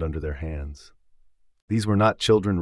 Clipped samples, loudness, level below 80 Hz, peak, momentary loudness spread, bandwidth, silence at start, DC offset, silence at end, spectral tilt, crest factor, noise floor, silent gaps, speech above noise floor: under 0.1%; -23 LUFS; -40 dBFS; -8 dBFS; 14 LU; 12 kHz; 0 s; under 0.1%; 0 s; -6 dB/octave; 18 dB; -56 dBFS; 1.62-1.68 s; 32 dB